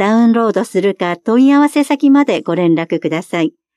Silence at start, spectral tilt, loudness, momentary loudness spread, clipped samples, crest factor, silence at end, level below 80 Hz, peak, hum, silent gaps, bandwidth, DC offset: 0 s; -6.5 dB/octave; -13 LUFS; 8 LU; under 0.1%; 10 dB; 0.25 s; -68 dBFS; -2 dBFS; none; none; 12.5 kHz; under 0.1%